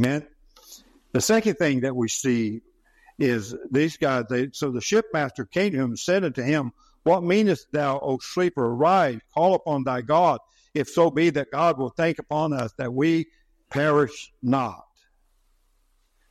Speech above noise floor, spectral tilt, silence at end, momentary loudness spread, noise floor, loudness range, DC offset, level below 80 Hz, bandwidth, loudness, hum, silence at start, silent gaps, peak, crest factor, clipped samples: 42 dB; -5.5 dB/octave; 1.55 s; 8 LU; -65 dBFS; 3 LU; under 0.1%; -60 dBFS; 14.5 kHz; -24 LUFS; none; 0 s; none; -6 dBFS; 18 dB; under 0.1%